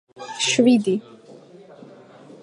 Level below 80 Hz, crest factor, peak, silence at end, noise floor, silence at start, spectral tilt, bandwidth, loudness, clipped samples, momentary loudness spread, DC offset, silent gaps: -76 dBFS; 18 dB; -4 dBFS; 1.1 s; -45 dBFS; 0.2 s; -3.5 dB/octave; 10.5 kHz; -19 LUFS; under 0.1%; 12 LU; under 0.1%; none